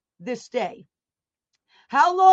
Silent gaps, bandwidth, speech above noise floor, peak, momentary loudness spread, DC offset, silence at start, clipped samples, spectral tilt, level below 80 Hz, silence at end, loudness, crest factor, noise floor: none; 8 kHz; over 71 dB; -4 dBFS; 15 LU; under 0.1%; 0.2 s; under 0.1%; -3.5 dB/octave; -78 dBFS; 0 s; -23 LUFS; 18 dB; under -90 dBFS